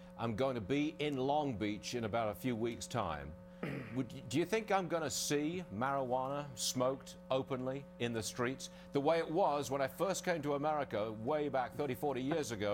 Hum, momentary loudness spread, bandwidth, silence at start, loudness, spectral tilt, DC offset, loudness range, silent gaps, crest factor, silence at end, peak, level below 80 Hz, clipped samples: none; 7 LU; 17 kHz; 0 s; -37 LUFS; -4.5 dB/octave; under 0.1%; 2 LU; none; 18 dB; 0 s; -20 dBFS; -64 dBFS; under 0.1%